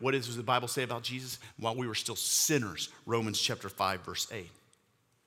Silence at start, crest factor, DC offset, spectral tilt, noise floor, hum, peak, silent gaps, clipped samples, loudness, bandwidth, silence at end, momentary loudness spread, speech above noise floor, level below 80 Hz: 0 s; 22 dB; under 0.1%; -2.5 dB/octave; -72 dBFS; none; -12 dBFS; none; under 0.1%; -32 LUFS; 19 kHz; 0.75 s; 10 LU; 39 dB; -74 dBFS